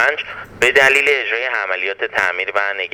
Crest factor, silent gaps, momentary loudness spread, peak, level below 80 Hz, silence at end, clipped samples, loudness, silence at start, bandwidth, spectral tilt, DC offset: 18 dB; none; 9 LU; 0 dBFS; -54 dBFS; 0.05 s; under 0.1%; -15 LUFS; 0 s; over 20 kHz; -1.5 dB/octave; under 0.1%